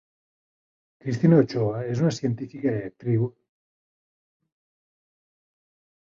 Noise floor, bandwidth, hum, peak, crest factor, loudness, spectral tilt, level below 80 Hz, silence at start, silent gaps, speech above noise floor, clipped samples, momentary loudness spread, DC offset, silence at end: under -90 dBFS; 7.6 kHz; none; -6 dBFS; 22 dB; -24 LUFS; -8 dB/octave; -62 dBFS; 1.05 s; none; over 67 dB; under 0.1%; 12 LU; under 0.1%; 2.75 s